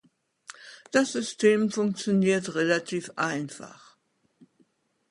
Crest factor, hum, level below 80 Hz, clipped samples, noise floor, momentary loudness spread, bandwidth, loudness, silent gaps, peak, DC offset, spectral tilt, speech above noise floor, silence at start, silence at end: 20 dB; none; -72 dBFS; under 0.1%; -69 dBFS; 22 LU; 11.5 kHz; -26 LUFS; none; -8 dBFS; under 0.1%; -5 dB/octave; 44 dB; 0.6 s; 1.4 s